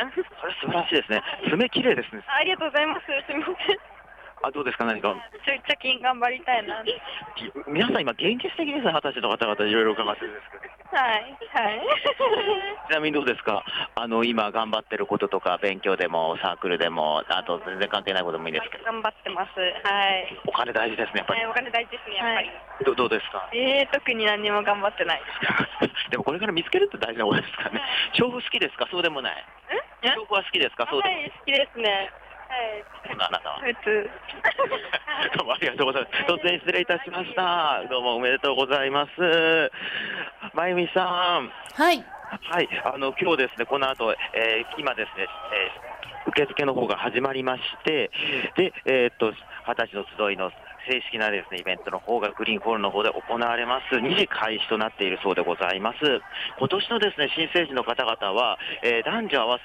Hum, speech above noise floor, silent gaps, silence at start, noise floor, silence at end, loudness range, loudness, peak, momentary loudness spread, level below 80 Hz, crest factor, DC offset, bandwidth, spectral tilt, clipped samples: none; 21 dB; none; 0 s; -47 dBFS; 0 s; 3 LU; -25 LUFS; -10 dBFS; 7 LU; -62 dBFS; 16 dB; under 0.1%; 14.5 kHz; -5 dB/octave; under 0.1%